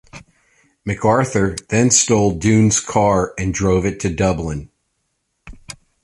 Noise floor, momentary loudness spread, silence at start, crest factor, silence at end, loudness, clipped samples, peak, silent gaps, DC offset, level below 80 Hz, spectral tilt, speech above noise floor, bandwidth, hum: -71 dBFS; 17 LU; 0.15 s; 18 dB; 0.3 s; -16 LUFS; under 0.1%; 0 dBFS; none; under 0.1%; -38 dBFS; -4.5 dB/octave; 54 dB; 11.5 kHz; none